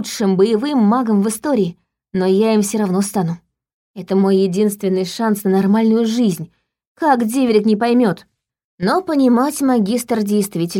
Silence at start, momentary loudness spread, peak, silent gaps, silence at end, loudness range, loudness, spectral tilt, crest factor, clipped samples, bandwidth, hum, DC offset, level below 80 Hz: 0 s; 7 LU; -2 dBFS; 3.73-3.94 s, 6.87-6.95 s, 8.64-8.78 s; 0 s; 2 LU; -16 LUFS; -6 dB/octave; 14 dB; under 0.1%; 17 kHz; none; under 0.1%; -60 dBFS